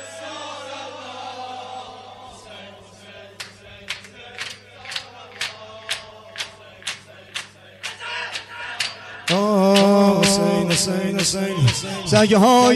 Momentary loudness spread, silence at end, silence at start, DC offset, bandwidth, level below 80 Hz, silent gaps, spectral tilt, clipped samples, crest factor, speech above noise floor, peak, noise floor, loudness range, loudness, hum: 24 LU; 0 s; 0 s; under 0.1%; 13 kHz; -54 dBFS; none; -4.5 dB/octave; under 0.1%; 18 dB; 26 dB; -2 dBFS; -43 dBFS; 18 LU; -20 LUFS; none